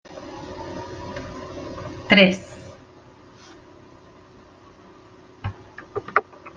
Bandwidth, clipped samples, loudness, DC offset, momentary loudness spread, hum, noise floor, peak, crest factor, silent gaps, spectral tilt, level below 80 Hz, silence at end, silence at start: 7.6 kHz; under 0.1%; -23 LUFS; under 0.1%; 24 LU; none; -49 dBFS; -2 dBFS; 26 dB; none; -5.5 dB/octave; -54 dBFS; 0 s; 0.05 s